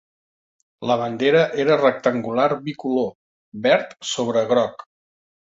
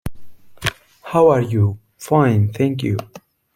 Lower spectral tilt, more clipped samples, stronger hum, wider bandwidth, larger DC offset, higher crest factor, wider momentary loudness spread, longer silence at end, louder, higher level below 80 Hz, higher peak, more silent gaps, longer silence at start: second, -5 dB/octave vs -7 dB/octave; neither; neither; second, 8 kHz vs 16 kHz; neither; about the same, 18 dB vs 18 dB; second, 10 LU vs 14 LU; first, 0.85 s vs 0.4 s; about the same, -20 LUFS vs -18 LUFS; second, -64 dBFS vs -46 dBFS; about the same, -4 dBFS vs -2 dBFS; first, 3.15-3.52 s vs none; first, 0.8 s vs 0.05 s